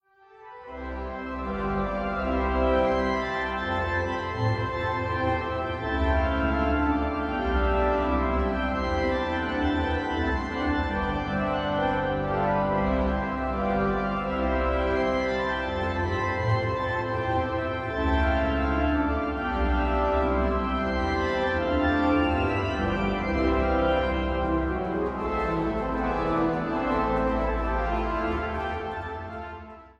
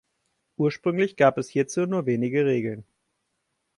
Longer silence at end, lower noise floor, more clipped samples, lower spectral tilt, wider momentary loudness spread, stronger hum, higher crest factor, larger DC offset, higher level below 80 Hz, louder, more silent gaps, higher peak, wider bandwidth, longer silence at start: second, 0.1 s vs 0.95 s; second, -51 dBFS vs -77 dBFS; neither; about the same, -7.5 dB/octave vs -6.5 dB/octave; second, 5 LU vs 10 LU; neither; about the same, 16 dB vs 18 dB; neither; first, -34 dBFS vs -68 dBFS; about the same, -26 LUFS vs -24 LUFS; neither; about the same, -10 dBFS vs -8 dBFS; second, 7.4 kHz vs 11.5 kHz; second, 0.4 s vs 0.6 s